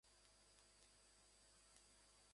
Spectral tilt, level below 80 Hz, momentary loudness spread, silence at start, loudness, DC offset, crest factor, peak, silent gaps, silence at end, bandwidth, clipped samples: -1 dB/octave; -82 dBFS; 1 LU; 0.05 s; -70 LUFS; under 0.1%; 28 dB; -44 dBFS; none; 0 s; 11.5 kHz; under 0.1%